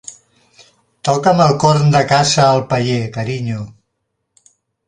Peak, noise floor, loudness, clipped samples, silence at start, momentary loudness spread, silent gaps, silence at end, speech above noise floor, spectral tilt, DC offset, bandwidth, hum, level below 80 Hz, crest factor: 0 dBFS; -72 dBFS; -14 LUFS; under 0.1%; 0.1 s; 12 LU; none; 1.15 s; 58 dB; -5 dB/octave; under 0.1%; 10.5 kHz; none; -50 dBFS; 16 dB